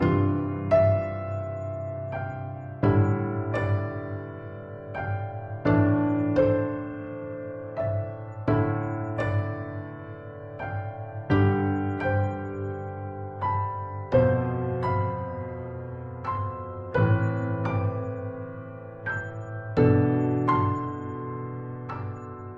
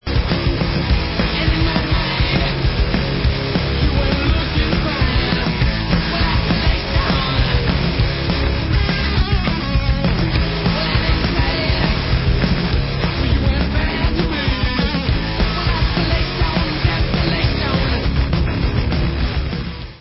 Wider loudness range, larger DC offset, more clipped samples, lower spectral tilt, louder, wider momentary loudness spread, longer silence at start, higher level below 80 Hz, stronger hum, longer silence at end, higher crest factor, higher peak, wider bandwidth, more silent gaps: about the same, 3 LU vs 1 LU; second, under 0.1% vs 0.2%; neither; about the same, -10 dB/octave vs -10 dB/octave; second, -28 LUFS vs -18 LUFS; first, 14 LU vs 2 LU; about the same, 0 s vs 0.05 s; second, -52 dBFS vs -20 dBFS; neither; about the same, 0 s vs 0.05 s; about the same, 18 dB vs 16 dB; second, -8 dBFS vs -2 dBFS; about the same, 5.4 kHz vs 5.8 kHz; neither